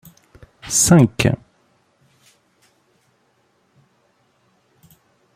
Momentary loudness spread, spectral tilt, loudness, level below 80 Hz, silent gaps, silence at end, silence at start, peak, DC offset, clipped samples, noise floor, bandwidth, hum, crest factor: 16 LU; -4.5 dB/octave; -15 LUFS; -50 dBFS; none; 4 s; 0.65 s; -2 dBFS; under 0.1%; under 0.1%; -63 dBFS; 16 kHz; none; 20 dB